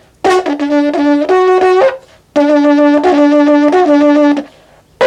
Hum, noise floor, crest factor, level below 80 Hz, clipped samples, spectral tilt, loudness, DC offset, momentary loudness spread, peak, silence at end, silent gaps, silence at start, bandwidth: none; -44 dBFS; 10 dB; -52 dBFS; under 0.1%; -4.5 dB/octave; -10 LUFS; under 0.1%; 5 LU; 0 dBFS; 0 s; none; 0.25 s; 9.2 kHz